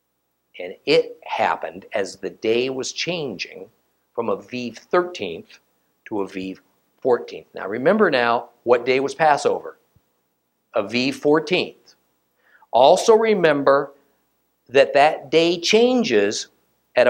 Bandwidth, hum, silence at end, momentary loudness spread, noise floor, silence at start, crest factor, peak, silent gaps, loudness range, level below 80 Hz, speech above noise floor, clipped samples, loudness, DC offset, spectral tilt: 16.5 kHz; none; 0 s; 15 LU; -72 dBFS; 0.55 s; 20 dB; 0 dBFS; none; 9 LU; -70 dBFS; 53 dB; under 0.1%; -20 LUFS; under 0.1%; -4 dB/octave